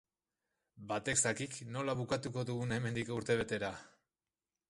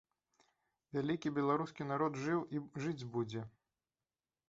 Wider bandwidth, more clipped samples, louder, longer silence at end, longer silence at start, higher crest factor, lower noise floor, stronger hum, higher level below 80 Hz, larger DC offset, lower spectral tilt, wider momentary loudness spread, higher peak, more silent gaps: first, 11.5 kHz vs 7.8 kHz; neither; about the same, -37 LUFS vs -39 LUFS; second, 0.8 s vs 1 s; second, 0.75 s vs 0.95 s; about the same, 20 dB vs 20 dB; about the same, under -90 dBFS vs under -90 dBFS; neither; first, -66 dBFS vs -76 dBFS; neither; second, -4 dB/octave vs -6.5 dB/octave; about the same, 9 LU vs 8 LU; about the same, -18 dBFS vs -20 dBFS; neither